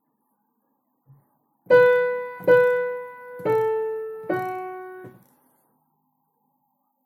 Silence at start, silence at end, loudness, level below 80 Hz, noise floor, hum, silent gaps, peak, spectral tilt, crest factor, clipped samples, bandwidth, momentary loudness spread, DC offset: 1.7 s; 1.95 s; -21 LUFS; -74 dBFS; -72 dBFS; none; none; -4 dBFS; -6.5 dB/octave; 20 dB; under 0.1%; 14 kHz; 20 LU; under 0.1%